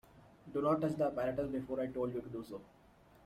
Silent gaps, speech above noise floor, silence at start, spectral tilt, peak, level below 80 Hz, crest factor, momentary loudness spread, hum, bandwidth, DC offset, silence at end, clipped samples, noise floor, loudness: none; 21 dB; 0.15 s; -8.5 dB/octave; -22 dBFS; -66 dBFS; 18 dB; 13 LU; none; 15 kHz; under 0.1%; 0.6 s; under 0.1%; -58 dBFS; -37 LUFS